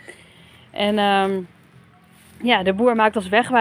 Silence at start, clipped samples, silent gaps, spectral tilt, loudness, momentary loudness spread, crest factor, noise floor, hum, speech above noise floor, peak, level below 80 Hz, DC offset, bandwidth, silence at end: 0.1 s; under 0.1%; none; -5 dB/octave; -19 LUFS; 11 LU; 20 dB; -51 dBFS; none; 32 dB; -2 dBFS; -64 dBFS; under 0.1%; 16 kHz; 0 s